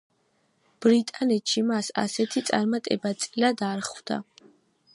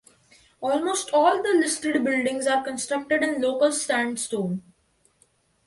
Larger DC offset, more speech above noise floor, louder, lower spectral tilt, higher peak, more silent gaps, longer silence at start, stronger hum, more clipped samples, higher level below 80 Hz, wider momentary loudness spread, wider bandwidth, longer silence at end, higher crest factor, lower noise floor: neither; about the same, 44 dB vs 42 dB; about the same, -26 LUFS vs -24 LUFS; about the same, -4 dB/octave vs -3.5 dB/octave; about the same, -6 dBFS vs -8 dBFS; neither; first, 0.8 s vs 0.6 s; neither; neither; second, -76 dBFS vs -68 dBFS; about the same, 9 LU vs 8 LU; about the same, 11.5 kHz vs 12 kHz; second, 0.7 s vs 1.05 s; about the same, 20 dB vs 18 dB; first, -69 dBFS vs -65 dBFS